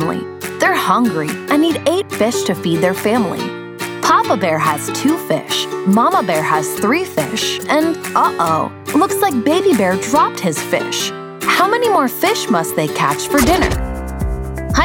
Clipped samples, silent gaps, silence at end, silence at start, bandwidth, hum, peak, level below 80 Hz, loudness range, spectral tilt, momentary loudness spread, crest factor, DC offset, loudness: under 0.1%; none; 0 s; 0 s; over 20 kHz; none; -2 dBFS; -32 dBFS; 1 LU; -4 dB/octave; 8 LU; 14 dB; under 0.1%; -16 LUFS